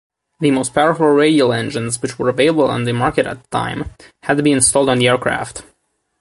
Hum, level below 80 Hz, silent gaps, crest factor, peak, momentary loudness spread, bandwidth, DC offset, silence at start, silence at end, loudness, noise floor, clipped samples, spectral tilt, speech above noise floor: none; -46 dBFS; none; 16 dB; -2 dBFS; 11 LU; 11.5 kHz; under 0.1%; 0.4 s; 0.6 s; -15 LUFS; -64 dBFS; under 0.1%; -4 dB/octave; 49 dB